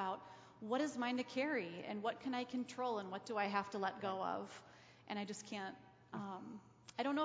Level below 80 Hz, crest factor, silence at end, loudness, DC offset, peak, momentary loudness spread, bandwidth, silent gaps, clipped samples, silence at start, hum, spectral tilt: -84 dBFS; 20 dB; 0 s; -43 LUFS; under 0.1%; -22 dBFS; 14 LU; 8 kHz; none; under 0.1%; 0 s; none; -4.5 dB/octave